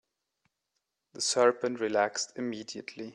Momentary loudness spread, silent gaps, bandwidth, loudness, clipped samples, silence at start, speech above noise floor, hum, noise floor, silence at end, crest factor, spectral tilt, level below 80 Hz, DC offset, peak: 14 LU; none; 11.5 kHz; -29 LUFS; under 0.1%; 1.15 s; 53 dB; none; -83 dBFS; 0 s; 20 dB; -2.5 dB/octave; -80 dBFS; under 0.1%; -12 dBFS